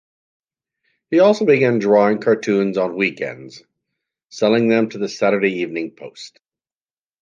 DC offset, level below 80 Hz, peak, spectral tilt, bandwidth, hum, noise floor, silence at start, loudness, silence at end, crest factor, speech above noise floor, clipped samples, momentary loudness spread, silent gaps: under 0.1%; -68 dBFS; -2 dBFS; -6 dB/octave; 7.6 kHz; none; under -90 dBFS; 1.1 s; -17 LUFS; 0.95 s; 16 dB; over 73 dB; under 0.1%; 20 LU; 4.24-4.28 s